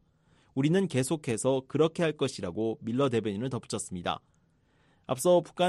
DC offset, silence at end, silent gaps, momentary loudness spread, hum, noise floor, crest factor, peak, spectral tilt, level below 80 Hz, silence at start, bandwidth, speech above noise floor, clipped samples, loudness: under 0.1%; 0 s; none; 10 LU; none; -67 dBFS; 16 dB; -12 dBFS; -5.5 dB/octave; -66 dBFS; 0.55 s; 13 kHz; 39 dB; under 0.1%; -30 LUFS